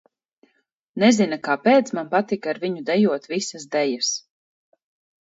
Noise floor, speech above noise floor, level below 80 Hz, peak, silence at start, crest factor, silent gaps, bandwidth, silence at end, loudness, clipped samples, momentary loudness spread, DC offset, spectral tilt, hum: -69 dBFS; 49 dB; -72 dBFS; -4 dBFS; 0.95 s; 20 dB; none; 8 kHz; 1 s; -21 LUFS; under 0.1%; 9 LU; under 0.1%; -4 dB/octave; none